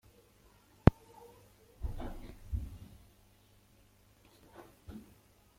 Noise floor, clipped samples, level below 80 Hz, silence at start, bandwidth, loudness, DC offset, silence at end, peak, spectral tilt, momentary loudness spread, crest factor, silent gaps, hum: -65 dBFS; under 0.1%; -46 dBFS; 0.85 s; 16.5 kHz; -35 LUFS; under 0.1%; 0.6 s; -2 dBFS; -8.5 dB/octave; 28 LU; 36 dB; none; 50 Hz at -60 dBFS